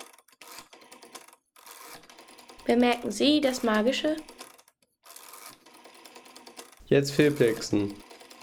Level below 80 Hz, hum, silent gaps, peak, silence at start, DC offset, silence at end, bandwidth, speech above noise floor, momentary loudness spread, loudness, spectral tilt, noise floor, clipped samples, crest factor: -62 dBFS; none; none; -8 dBFS; 0 s; under 0.1%; 0.25 s; 19 kHz; 38 dB; 25 LU; -25 LUFS; -5 dB/octave; -62 dBFS; under 0.1%; 22 dB